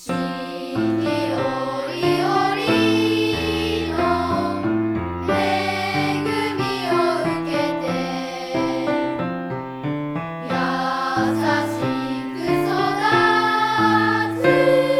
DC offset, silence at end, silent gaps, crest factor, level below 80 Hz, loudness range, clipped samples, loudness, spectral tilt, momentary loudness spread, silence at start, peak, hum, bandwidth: under 0.1%; 0 s; none; 18 dB; -48 dBFS; 5 LU; under 0.1%; -21 LUFS; -5.5 dB/octave; 9 LU; 0 s; -4 dBFS; none; 14.5 kHz